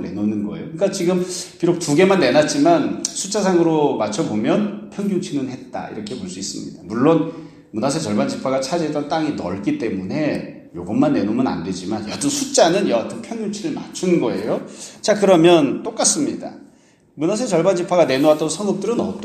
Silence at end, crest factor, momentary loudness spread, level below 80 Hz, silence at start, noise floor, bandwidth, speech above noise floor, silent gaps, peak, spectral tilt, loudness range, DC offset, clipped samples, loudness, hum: 0 s; 18 dB; 13 LU; -58 dBFS; 0 s; -52 dBFS; 14.5 kHz; 33 dB; none; 0 dBFS; -4.5 dB/octave; 5 LU; under 0.1%; under 0.1%; -19 LUFS; none